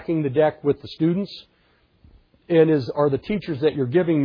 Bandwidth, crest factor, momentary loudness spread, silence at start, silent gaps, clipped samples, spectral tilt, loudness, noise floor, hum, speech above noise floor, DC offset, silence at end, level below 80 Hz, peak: 5.4 kHz; 18 dB; 9 LU; 0 s; none; under 0.1%; -9.5 dB/octave; -21 LUFS; -61 dBFS; none; 41 dB; under 0.1%; 0 s; -56 dBFS; -4 dBFS